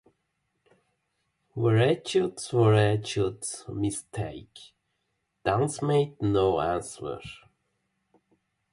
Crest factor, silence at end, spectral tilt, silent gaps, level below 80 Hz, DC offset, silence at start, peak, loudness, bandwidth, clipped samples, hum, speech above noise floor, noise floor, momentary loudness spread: 20 dB; 1.35 s; -6 dB/octave; none; -54 dBFS; under 0.1%; 1.55 s; -8 dBFS; -27 LUFS; 11.5 kHz; under 0.1%; none; 52 dB; -78 dBFS; 15 LU